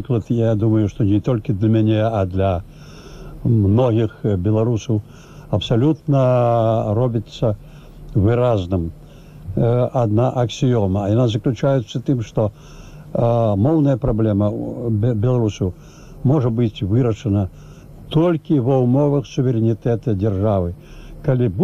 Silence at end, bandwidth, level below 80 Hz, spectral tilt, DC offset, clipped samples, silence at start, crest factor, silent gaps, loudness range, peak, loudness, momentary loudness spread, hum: 0 s; 7.4 kHz; -40 dBFS; -8.5 dB/octave; 0.2%; under 0.1%; 0 s; 14 dB; none; 2 LU; -4 dBFS; -19 LUFS; 8 LU; none